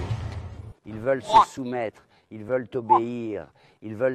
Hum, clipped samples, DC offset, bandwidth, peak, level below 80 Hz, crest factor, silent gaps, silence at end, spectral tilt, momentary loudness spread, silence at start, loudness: none; under 0.1%; under 0.1%; 12.5 kHz; -4 dBFS; -48 dBFS; 22 dB; none; 0 s; -6 dB/octave; 22 LU; 0 s; -25 LUFS